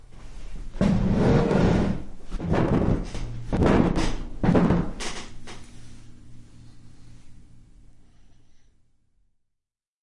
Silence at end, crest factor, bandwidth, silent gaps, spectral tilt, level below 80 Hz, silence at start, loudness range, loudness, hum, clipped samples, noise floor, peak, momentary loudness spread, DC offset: 1.4 s; 20 dB; 11.5 kHz; none; -7.5 dB/octave; -34 dBFS; 0 s; 8 LU; -24 LUFS; none; under 0.1%; -83 dBFS; -6 dBFS; 22 LU; under 0.1%